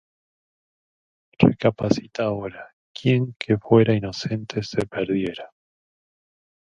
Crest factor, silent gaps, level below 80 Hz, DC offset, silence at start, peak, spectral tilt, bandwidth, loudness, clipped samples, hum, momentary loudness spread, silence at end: 24 dB; 2.73-2.95 s; -54 dBFS; under 0.1%; 1.4 s; 0 dBFS; -7.5 dB/octave; 9.8 kHz; -22 LUFS; under 0.1%; none; 13 LU; 1.2 s